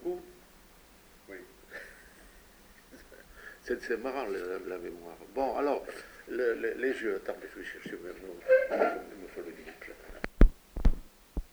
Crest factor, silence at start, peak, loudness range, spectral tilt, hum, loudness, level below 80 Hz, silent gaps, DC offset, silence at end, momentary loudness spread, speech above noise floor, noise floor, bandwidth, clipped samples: 30 dB; 0 s; -2 dBFS; 13 LU; -6.5 dB/octave; none; -33 LUFS; -36 dBFS; none; under 0.1%; 0.1 s; 21 LU; 24 dB; -58 dBFS; over 20 kHz; under 0.1%